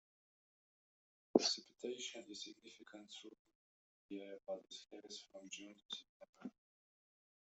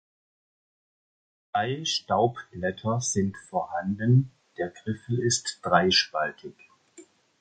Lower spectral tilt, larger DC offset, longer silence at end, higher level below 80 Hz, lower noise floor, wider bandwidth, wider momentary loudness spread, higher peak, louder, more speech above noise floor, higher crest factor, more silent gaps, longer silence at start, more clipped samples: second, -2.5 dB/octave vs -4 dB/octave; neither; first, 1.05 s vs 0.4 s; second, under -90 dBFS vs -56 dBFS; first, under -90 dBFS vs -54 dBFS; second, 8.2 kHz vs 9.2 kHz; first, 20 LU vs 12 LU; second, -12 dBFS vs -6 dBFS; second, -45 LUFS vs -26 LUFS; first, over 40 dB vs 28 dB; first, 36 dB vs 22 dB; first, 3.39-3.45 s, 3.55-4.09 s, 5.85-5.89 s, 6.09-6.20 s, 6.29-6.33 s vs none; second, 1.35 s vs 1.55 s; neither